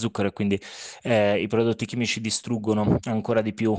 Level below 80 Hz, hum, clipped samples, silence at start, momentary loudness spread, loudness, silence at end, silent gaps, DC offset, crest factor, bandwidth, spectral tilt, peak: -54 dBFS; none; under 0.1%; 0 s; 5 LU; -24 LUFS; 0 s; none; under 0.1%; 18 dB; 9.8 kHz; -5.5 dB/octave; -8 dBFS